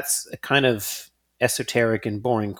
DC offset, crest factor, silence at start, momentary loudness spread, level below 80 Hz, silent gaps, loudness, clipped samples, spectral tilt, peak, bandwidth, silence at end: under 0.1%; 20 dB; 0 s; 8 LU; -60 dBFS; none; -23 LUFS; under 0.1%; -3.5 dB/octave; -4 dBFS; 19.5 kHz; 0 s